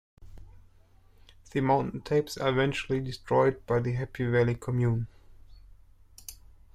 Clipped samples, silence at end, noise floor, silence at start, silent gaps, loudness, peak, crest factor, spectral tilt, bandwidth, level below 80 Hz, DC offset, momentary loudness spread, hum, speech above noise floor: under 0.1%; 0.4 s; -58 dBFS; 0.2 s; none; -28 LUFS; -12 dBFS; 18 dB; -7 dB/octave; 15 kHz; -52 dBFS; under 0.1%; 15 LU; none; 31 dB